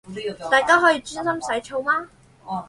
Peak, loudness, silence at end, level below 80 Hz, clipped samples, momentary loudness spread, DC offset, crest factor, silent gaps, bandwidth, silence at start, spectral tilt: -2 dBFS; -20 LUFS; 0 s; -58 dBFS; under 0.1%; 14 LU; under 0.1%; 20 dB; none; 11.5 kHz; 0.05 s; -3 dB/octave